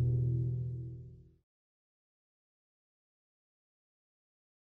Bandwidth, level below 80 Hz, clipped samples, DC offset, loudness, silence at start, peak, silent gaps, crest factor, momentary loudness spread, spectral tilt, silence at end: 0.9 kHz; -56 dBFS; under 0.1%; under 0.1%; -36 LUFS; 0 s; -24 dBFS; none; 16 dB; 18 LU; -13 dB/octave; 3.55 s